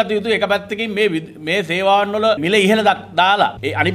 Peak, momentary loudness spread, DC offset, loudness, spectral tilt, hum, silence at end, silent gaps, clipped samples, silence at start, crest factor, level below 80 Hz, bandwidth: 0 dBFS; 6 LU; under 0.1%; -16 LUFS; -4.5 dB/octave; none; 0 s; none; under 0.1%; 0 s; 16 dB; -54 dBFS; 15.5 kHz